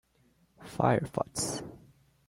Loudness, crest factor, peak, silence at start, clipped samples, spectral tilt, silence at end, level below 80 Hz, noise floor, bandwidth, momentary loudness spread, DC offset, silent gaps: -31 LUFS; 22 dB; -12 dBFS; 0.6 s; under 0.1%; -5 dB/octave; 0.5 s; -60 dBFS; -68 dBFS; 16.5 kHz; 20 LU; under 0.1%; none